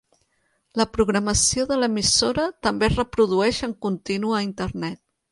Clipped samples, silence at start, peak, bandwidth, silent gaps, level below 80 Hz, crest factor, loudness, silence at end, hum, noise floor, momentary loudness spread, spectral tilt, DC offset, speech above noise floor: under 0.1%; 0.75 s; -6 dBFS; 11.5 kHz; none; -40 dBFS; 18 dB; -22 LUFS; 0.35 s; none; -69 dBFS; 10 LU; -3.5 dB/octave; under 0.1%; 47 dB